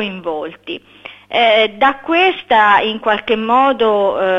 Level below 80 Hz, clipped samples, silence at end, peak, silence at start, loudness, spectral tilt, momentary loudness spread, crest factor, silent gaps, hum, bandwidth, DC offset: -54 dBFS; under 0.1%; 0 s; 0 dBFS; 0 s; -13 LUFS; -5.5 dB/octave; 14 LU; 14 dB; none; none; 7.8 kHz; under 0.1%